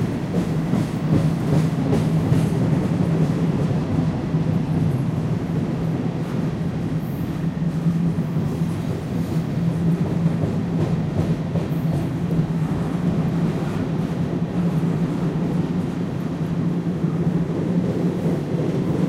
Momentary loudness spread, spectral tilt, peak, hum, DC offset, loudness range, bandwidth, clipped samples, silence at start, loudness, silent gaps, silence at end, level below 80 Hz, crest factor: 4 LU; -8.5 dB/octave; -6 dBFS; none; under 0.1%; 3 LU; 13 kHz; under 0.1%; 0 s; -22 LUFS; none; 0 s; -42 dBFS; 16 dB